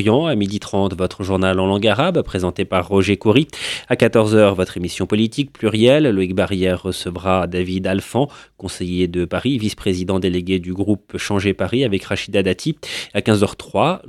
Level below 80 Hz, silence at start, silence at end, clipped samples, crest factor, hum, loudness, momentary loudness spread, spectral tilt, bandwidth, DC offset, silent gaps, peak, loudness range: -46 dBFS; 0 s; 0 s; under 0.1%; 18 dB; none; -18 LUFS; 8 LU; -6 dB/octave; 13.5 kHz; under 0.1%; none; 0 dBFS; 4 LU